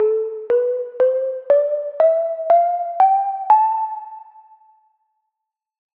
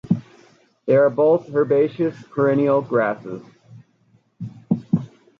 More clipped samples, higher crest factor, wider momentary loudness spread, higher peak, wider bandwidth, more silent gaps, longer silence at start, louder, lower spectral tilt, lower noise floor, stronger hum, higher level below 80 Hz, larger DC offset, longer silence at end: neither; about the same, 16 dB vs 16 dB; second, 8 LU vs 18 LU; first, -2 dBFS vs -6 dBFS; second, 4.2 kHz vs 6.8 kHz; neither; about the same, 0 s vs 0.05 s; about the same, -18 LUFS vs -20 LUFS; second, -6 dB/octave vs -9.5 dB/octave; first, -82 dBFS vs -60 dBFS; neither; second, -78 dBFS vs -62 dBFS; neither; first, 1.75 s vs 0.3 s